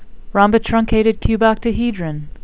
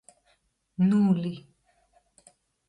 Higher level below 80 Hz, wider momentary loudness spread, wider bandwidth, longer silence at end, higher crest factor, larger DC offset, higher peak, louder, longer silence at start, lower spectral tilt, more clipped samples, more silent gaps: first, -30 dBFS vs -68 dBFS; second, 8 LU vs 21 LU; second, 4 kHz vs 10 kHz; second, 0 s vs 1.3 s; about the same, 16 dB vs 16 dB; first, 2% vs under 0.1%; first, 0 dBFS vs -14 dBFS; first, -16 LUFS vs -25 LUFS; second, 0 s vs 0.8 s; first, -11 dB/octave vs -8.5 dB/octave; neither; neither